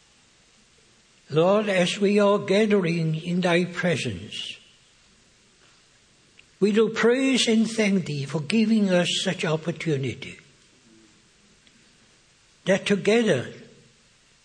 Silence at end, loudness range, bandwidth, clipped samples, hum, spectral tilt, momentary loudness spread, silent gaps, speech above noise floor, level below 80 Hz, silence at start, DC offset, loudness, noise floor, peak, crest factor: 0.8 s; 8 LU; 10 kHz; under 0.1%; none; -5 dB/octave; 12 LU; none; 37 dB; -68 dBFS; 1.3 s; under 0.1%; -23 LUFS; -59 dBFS; -4 dBFS; 20 dB